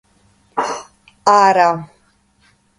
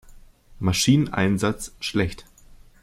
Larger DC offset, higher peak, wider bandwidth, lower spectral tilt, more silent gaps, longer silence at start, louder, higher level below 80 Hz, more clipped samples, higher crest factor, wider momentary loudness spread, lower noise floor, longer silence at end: neither; first, 0 dBFS vs -6 dBFS; second, 11.5 kHz vs 16 kHz; about the same, -4 dB/octave vs -5 dB/octave; neither; first, 0.55 s vs 0.15 s; first, -15 LUFS vs -23 LUFS; second, -62 dBFS vs -46 dBFS; neither; about the same, 18 dB vs 18 dB; first, 15 LU vs 10 LU; first, -57 dBFS vs -49 dBFS; first, 0.95 s vs 0.25 s